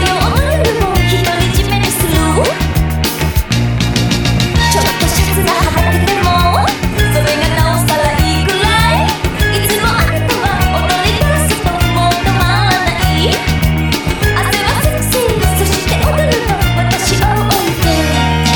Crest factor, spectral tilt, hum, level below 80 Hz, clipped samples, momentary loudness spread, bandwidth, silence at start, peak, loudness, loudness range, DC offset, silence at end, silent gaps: 12 dB; -4.5 dB/octave; none; -20 dBFS; under 0.1%; 3 LU; 19.5 kHz; 0 s; 0 dBFS; -12 LUFS; 1 LU; under 0.1%; 0 s; none